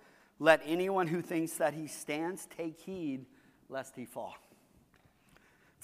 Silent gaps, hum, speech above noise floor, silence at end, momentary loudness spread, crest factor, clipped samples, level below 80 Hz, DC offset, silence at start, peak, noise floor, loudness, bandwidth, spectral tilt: none; none; 33 dB; 1.45 s; 17 LU; 26 dB; under 0.1%; -76 dBFS; under 0.1%; 0.4 s; -10 dBFS; -67 dBFS; -34 LUFS; 15.5 kHz; -4.5 dB/octave